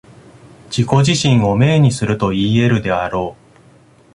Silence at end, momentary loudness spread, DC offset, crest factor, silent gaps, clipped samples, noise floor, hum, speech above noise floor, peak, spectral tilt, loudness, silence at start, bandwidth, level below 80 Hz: 0.8 s; 9 LU; under 0.1%; 14 dB; none; under 0.1%; -47 dBFS; none; 33 dB; 0 dBFS; -6 dB/octave; -15 LUFS; 0.7 s; 11.5 kHz; -42 dBFS